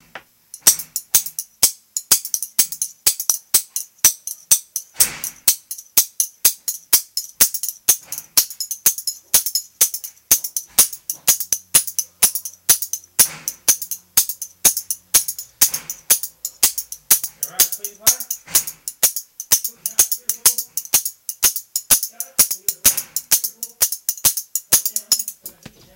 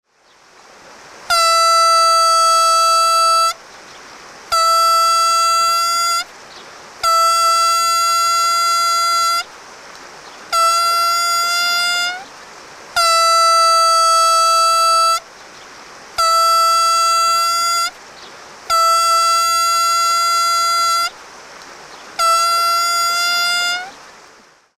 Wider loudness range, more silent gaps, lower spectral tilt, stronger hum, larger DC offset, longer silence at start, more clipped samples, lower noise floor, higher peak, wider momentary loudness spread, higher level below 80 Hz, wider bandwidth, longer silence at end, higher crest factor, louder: about the same, 1 LU vs 3 LU; neither; about the same, 1.5 dB/octave vs 2 dB/octave; neither; neither; second, 0.15 s vs 1.15 s; neither; second, -43 dBFS vs -50 dBFS; first, 0 dBFS vs -4 dBFS; about the same, 8 LU vs 8 LU; about the same, -54 dBFS vs -58 dBFS; first, over 20 kHz vs 15.5 kHz; second, 0.45 s vs 0.85 s; first, 20 dB vs 12 dB; second, -17 LUFS vs -13 LUFS